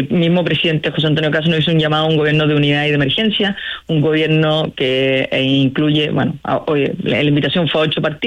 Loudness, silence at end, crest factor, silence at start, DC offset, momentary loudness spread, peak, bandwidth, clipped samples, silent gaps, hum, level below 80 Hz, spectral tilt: -15 LUFS; 0 s; 10 dB; 0 s; under 0.1%; 4 LU; -6 dBFS; 8.2 kHz; under 0.1%; none; none; -48 dBFS; -7.5 dB/octave